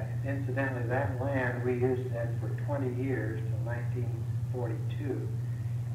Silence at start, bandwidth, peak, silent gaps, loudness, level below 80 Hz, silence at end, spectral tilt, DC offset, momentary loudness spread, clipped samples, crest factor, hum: 0 s; 8.8 kHz; -18 dBFS; none; -33 LUFS; -56 dBFS; 0 s; -8.5 dB/octave; under 0.1%; 4 LU; under 0.1%; 14 dB; none